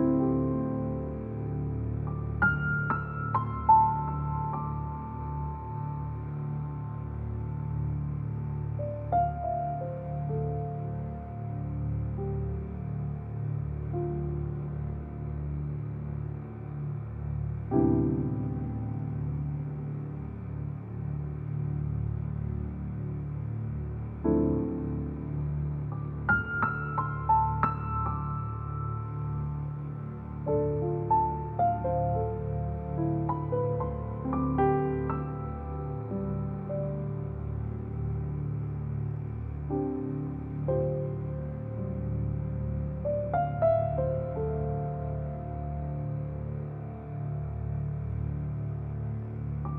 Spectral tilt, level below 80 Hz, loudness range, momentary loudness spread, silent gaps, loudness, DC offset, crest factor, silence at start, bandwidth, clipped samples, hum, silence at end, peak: -12.5 dB/octave; -42 dBFS; 6 LU; 9 LU; none; -32 LUFS; under 0.1%; 20 dB; 0 s; 3 kHz; under 0.1%; none; 0 s; -10 dBFS